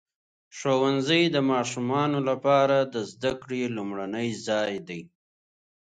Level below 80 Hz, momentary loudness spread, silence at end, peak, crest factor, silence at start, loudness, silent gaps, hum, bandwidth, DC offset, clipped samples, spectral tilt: -68 dBFS; 11 LU; 0.9 s; -8 dBFS; 18 dB; 0.55 s; -26 LUFS; none; none; 9.4 kHz; under 0.1%; under 0.1%; -5 dB/octave